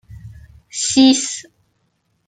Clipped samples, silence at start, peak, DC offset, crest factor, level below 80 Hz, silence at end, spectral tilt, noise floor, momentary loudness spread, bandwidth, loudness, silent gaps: under 0.1%; 0.1 s; 0 dBFS; under 0.1%; 18 dB; -50 dBFS; 0.85 s; -2 dB/octave; -66 dBFS; 18 LU; 9.4 kHz; -15 LUFS; none